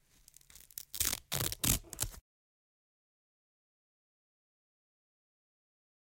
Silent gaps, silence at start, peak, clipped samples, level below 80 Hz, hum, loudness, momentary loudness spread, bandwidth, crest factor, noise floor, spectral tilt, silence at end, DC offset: none; 0.75 s; -12 dBFS; under 0.1%; -54 dBFS; none; -34 LUFS; 14 LU; 17 kHz; 30 dB; -63 dBFS; -2 dB/octave; 3.8 s; under 0.1%